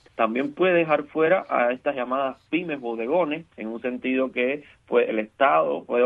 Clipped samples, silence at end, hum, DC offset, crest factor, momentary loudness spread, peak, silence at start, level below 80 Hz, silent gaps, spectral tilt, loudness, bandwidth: under 0.1%; 0 s; none; under 0.1%; 18 dB; 9 LU; -6 dBFS; 0.2 s; -68 dBFS; none; -8 dB/octave; -24 LUFS; 4.7 kHz